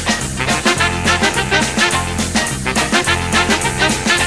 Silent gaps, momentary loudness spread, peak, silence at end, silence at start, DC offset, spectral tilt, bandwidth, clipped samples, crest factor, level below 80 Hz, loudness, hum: none; 4 LU; 0 dBFS; 0 s; 0 s; 0.6%; -3 dB/octave; 14 kHz; under 0.1%; 16 dB; -32 dBFS; -15 LUFS; none